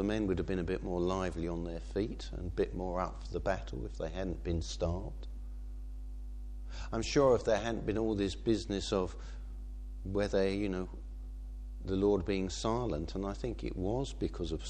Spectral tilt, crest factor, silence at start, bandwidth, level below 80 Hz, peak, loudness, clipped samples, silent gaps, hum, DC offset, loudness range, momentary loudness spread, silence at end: -6 dB/octave; 18 dB; 0 s; 9.6 kHz; -42 dBFS; -16 dBFS; -35 LUFS; under 0.1%; none; none; under 0.1%; 6 LU; 16 LU; 0 s